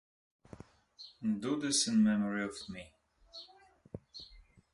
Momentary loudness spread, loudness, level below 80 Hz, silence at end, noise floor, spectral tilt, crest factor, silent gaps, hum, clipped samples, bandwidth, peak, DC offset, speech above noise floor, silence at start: 26 LU; -32 LUFS; -66 dBFS; 0.35 s; -62 dBFS; -3.5 dB/octave; 18 dB; none; none; under 0.1%; 11.5 kHz; -18 dBFS; under 0.1%; 29 dB; 1 s